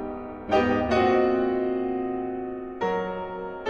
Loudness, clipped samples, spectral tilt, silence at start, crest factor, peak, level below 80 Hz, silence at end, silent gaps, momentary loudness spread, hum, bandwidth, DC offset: -26 LUFS; under 0.1%; -7 dB/octave; 0 s; 16 dB; -10 dBFS; -48 dBFS; 0 s; none; 12 LU; none; 7 kHz; under 0.1%